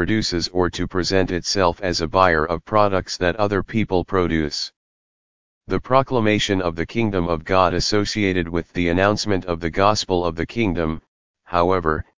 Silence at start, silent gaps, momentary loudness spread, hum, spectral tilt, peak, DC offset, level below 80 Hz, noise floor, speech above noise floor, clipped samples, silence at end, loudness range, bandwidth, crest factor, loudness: 0 s; 4.76-5.61 s, 11.08-11.34 s; 7 LU; none; -5 dB/octave; 0 dBFS; 2%; -38 dBFS; under -90 dBFS; over 70 dB; under 0.1%; 0 s; 2 LU; 7.6 kHz; 20 dB; -20 LUFS